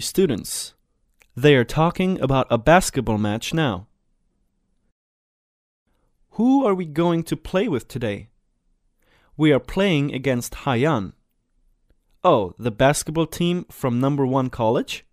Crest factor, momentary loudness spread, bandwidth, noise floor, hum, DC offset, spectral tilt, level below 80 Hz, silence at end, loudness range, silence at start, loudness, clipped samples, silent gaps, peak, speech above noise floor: 20 dB; 11 LU; 15.5 kHz; -67 dBFS; none; under 0.1%; -5.5 dB/octave; -44 dBFS; 0.15 s; 6 LU; 0 s; -21 LUFS; under 0.1%; 4.92-5.86 s; -2 dBFS; 47 dB